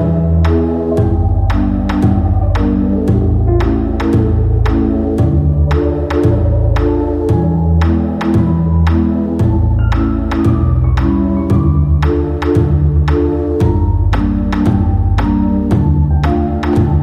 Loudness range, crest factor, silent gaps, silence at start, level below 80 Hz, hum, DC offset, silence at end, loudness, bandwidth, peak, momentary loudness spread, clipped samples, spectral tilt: 0 LU; 12 dB; none; 0 s; -18 dBFS; none; under 0.1%; 0 s; -13 LUFS; 7 kHz; 0 dBFS; 2 LU; under 0.1%; -9.5 dB/octave